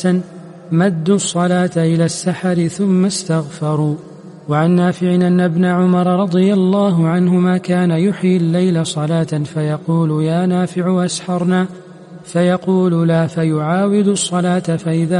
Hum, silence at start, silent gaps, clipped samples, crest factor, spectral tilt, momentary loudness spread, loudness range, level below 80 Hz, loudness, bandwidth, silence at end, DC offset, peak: none; 0 s; none; under 0.1%; 12 dB; -6.5 dB/octave; 6 LU; 3 LU; -58 dBFS; -15 LUFS; 11.5 kHz; 0 s; under 0.1%; -2 dBFS